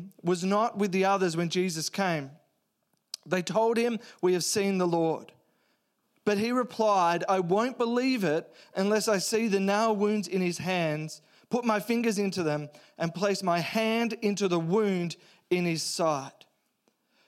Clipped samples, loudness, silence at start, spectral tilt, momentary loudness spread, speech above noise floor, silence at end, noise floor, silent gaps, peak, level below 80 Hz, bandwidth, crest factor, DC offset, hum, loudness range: under 0.1%; -28 LUFS; 0 s; -5 dB/octave; 9 LU; 49 dB; 0.95 s; -76 dBFS; none; -12 dBFS; -80 dBFS; 16 kHz; 16 dB; under 0.1%; none; 3 LU